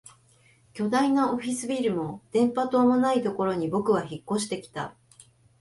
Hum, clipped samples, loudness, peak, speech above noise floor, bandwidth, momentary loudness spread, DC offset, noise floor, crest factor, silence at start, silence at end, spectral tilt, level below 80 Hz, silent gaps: none; under 0.1%; -26 LUFS; -12 dBFS; 35 dB; 11.5 kHz; 11 LU; under 0.1%; -60 dBFS; 14 dB; 0.75 s; 0.7 s; -5.5 dB/octave; -66 dBFS; none